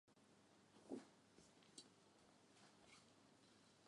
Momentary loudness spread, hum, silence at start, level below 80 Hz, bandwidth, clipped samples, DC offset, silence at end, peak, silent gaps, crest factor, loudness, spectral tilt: 11 LU; none; 0.05 s; under -90 dBFS; 11 kHz; under 0.1%; under 0.1%; 0 s; -40 dBFS; none; 26 dB; -63 LUFS; -3.5 dB/octave